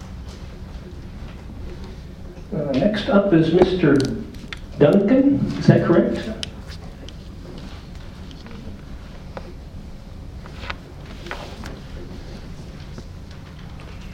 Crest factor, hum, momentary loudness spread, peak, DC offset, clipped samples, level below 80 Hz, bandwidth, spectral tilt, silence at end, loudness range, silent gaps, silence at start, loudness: 22 dB; none; 22 LU; 0 dBFS; under 0.1%; under 0.1%; -38 dBFS; 11.5 kHz; -7.5 dB/octave; 0 s; 20 LU; none; 0 s; -19 LUFS